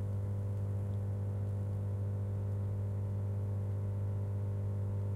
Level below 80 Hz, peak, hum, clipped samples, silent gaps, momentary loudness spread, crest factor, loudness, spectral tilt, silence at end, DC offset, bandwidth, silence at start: -56 dBFS; -28 dBFS; 50 Hz at -35 dBFS; under 0.1%; none; 0 LU; 6 dB; -37 LUFS; -10 dB/octave; 0 s; under 0.1%; 2.4 kHz; 0 s